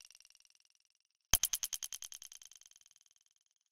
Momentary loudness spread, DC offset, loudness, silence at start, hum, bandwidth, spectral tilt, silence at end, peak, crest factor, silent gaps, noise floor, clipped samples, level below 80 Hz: 25 LU; under 0.1%; -36 LUFS; 1.35 s; none; 16.5 kHz; 0.5 dB/octave; 1.4 s; -8 dBFS; 36 dB; none; -71 dBFS; under 0.1%; -56 dBFS